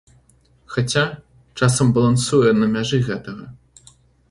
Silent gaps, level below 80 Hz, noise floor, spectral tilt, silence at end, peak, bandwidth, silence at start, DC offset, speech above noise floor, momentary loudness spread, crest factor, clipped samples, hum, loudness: none; -48 dBFS; -56 dBFS; -5.5 dB/octave; 0.75 s; -2 dBFS; 11.5 kHz; 0.7 s; under 0.1%; 38 dB; 19 LU; 18 dB; under 0.1%; none; -18 LUFS